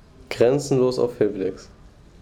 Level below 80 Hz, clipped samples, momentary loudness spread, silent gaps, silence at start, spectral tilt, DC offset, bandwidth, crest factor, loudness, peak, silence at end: -50 dBFS; under 0.1%; 13 LU; none; 0.3 s; -6 dB/octave; under 0.1%; 16 kHz; 16 dB; -22 LUFS; -6 dBFS; 0.55 s